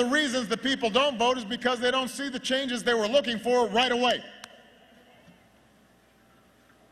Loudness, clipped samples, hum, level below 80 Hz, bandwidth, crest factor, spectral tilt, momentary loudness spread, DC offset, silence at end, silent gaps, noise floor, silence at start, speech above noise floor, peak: -26 LUFS; under 0.1%; none; -64 dBFS; 14.5 kHz; 20 dB; -3 dB/octave; 7 LU; under 0.1%; 2.45 s; none; -60 dBFS; 0 s; 34 dB; -8 dBFS